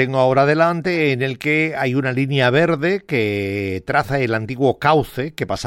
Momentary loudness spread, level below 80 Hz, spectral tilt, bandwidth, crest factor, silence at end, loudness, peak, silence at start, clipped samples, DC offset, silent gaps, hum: 7 LU; -50 dBFS; -6.5 dB/octave; 16.5 kHz; 14 dB; 0 s; -18 LUFS; -4 dBFS; 0 s; under 0.1%; under 0.1%; none; none